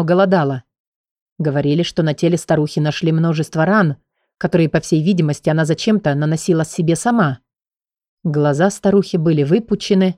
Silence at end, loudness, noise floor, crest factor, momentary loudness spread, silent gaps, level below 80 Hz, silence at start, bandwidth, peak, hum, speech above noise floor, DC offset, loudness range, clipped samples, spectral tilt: 0.05 s; -17 LUFS; under -90 dBFS; 14 dB; 6 LU; 0.80-1.04 s, 1.11-1.26 s, 1.32-1.36 s, 8.08-8.17 s; -52 dBFS; 0 s; 12 kHz; -2 dBFS; none; over 75 dB; under 0.1%; 1 LU; under 0.1%; -6.5 dB/octave